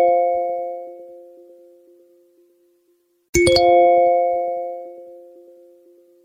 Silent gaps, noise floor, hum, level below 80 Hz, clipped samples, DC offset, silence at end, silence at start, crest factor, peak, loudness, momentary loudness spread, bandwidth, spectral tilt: 3.29-3.33 s; -63 dBFS; none; -46 dBFS; under 0.1%; under 0.1%; 1.1 s; 0 s; 18 dB; -4 dBFS; -17 LUFS; 24 LU; 15.5 kHz; -4 dB/octave